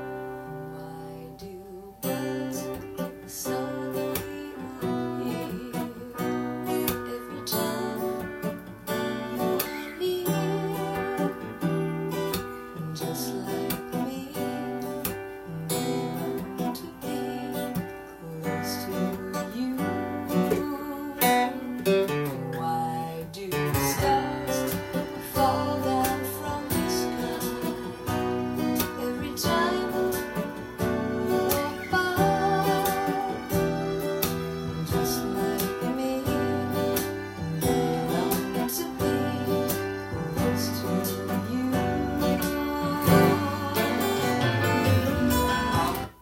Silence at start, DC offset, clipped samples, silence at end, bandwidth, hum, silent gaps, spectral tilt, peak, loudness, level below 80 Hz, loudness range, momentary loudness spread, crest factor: 0 s; under 0.1%; under 0.1%; 0 s; 16.5 kHz; none; none; -5 dB/octave; -6 dBFS; -28 LUFS; -50 dBFS; 7 LU; 10 LU; 22 dB